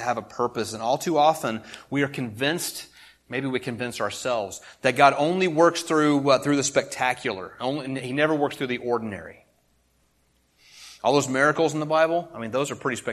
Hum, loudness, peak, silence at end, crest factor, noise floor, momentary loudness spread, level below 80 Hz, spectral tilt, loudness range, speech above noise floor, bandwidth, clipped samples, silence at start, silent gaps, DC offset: none; -24 LUFS; -2 dBFS; 0 s; 22 dB; -66 dBFS; 11 LU; -64 dBFS; -4.5 dB/octave; 7 LU; 42 dB; 13 kHz; under 0.1%; 0 s; none; under 0.1%